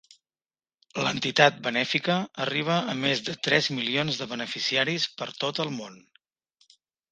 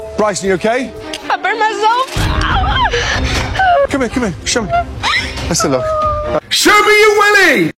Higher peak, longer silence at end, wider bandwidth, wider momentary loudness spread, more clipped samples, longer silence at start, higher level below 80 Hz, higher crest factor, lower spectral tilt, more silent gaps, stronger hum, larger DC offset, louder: about the same, 0 dBFS vs 0 dBFS; first, 1.15 s vs 0.05 s; second, 9.8 kHz vs 16.5 kHz; about the same, 10 LU vs 9 LU; neither; first, 0.95 s vs 0 s; second, -70 dBFS vs -26 dBFS; first, 28 dB vs 12 dB; about the same, -4 dB/octave vs -3.5 dB/octave; neither; neither; neither; second, -25 LUFS vs -12 LUFS